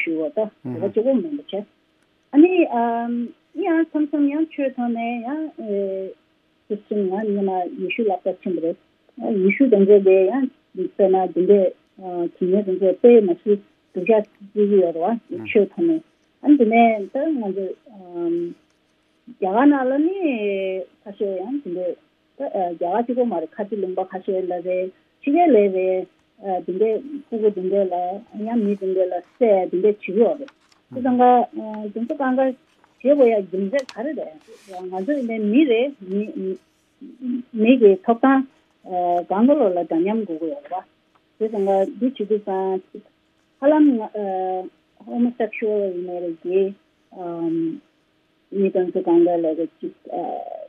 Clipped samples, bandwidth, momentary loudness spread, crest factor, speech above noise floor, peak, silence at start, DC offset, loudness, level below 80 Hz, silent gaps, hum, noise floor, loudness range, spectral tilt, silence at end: under 0.1%; 6.4 kHz; 15 LU; 18 dB; 44 dB; -2 dBFS; 0 s; under 0.1%; -20 LUFS; -78 dBFS; none; none; -63 dBFS; 6 LU; -8.5 dB/octave; 0 s